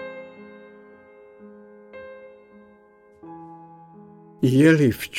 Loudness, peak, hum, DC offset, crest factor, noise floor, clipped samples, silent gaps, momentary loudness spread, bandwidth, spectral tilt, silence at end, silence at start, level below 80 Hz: -18 LUFS; -4 dBFS; none; under 0.1%; 20 dB; -54 dBFS; under 0.1%; none; 29 LU; 16.5 kHz; -7 dB/octave; 0 s; 0 s; -60 dBFS